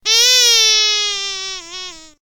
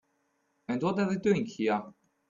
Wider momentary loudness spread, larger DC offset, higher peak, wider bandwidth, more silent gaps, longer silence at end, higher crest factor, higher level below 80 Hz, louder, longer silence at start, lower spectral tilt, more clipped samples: first, 20 LU vs 7 LU; neither; first, 0 dBFS vs -14 dBFS; first, 17.5 kHz vs 7.4 kHz; neither; second, 0.15 s vs 0.4 s; about the same, 16 dB vs 18 dB; first, -52 dBFS vs -70 dBFS; first, -11 LUFS vs -30 LUFS; second, 0.05 s vs 0.7 s; second, 4 dB/octave vs -7 dB/octave; neither